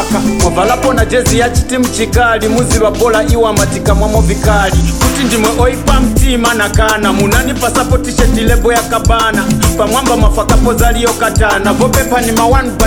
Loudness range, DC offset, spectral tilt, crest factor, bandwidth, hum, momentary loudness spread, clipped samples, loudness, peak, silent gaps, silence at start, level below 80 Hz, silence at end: 0 LU; under 0.1%; -4.5 dB/octave; 10 dB; 18.5 kHz; none; 2 LU; under 0.1%; -10 LUFS; 0 dBFS; none; 0 s; -16 dBFS; 0 s